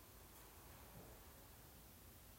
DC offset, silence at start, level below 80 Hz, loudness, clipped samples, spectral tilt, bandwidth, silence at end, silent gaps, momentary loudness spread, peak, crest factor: under 0.1%; 0 s; -68 dBFS; -61 LUFS; under 0.1%; -3.5 dB/octave; 16 kHz; 0 s; none; 2 LU; -46 dBFS; 14 dB